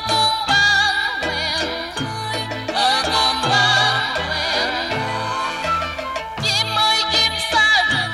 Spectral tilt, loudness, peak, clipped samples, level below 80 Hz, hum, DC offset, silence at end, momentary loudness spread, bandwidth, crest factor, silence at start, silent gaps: -2 dB/octave; -17 LUFS; -4 dBFS; under 0.1%; -44 dBFS; none; under 0.1%; 0 s; 10 LU; 16 kHz; 14 dB; 0 s; none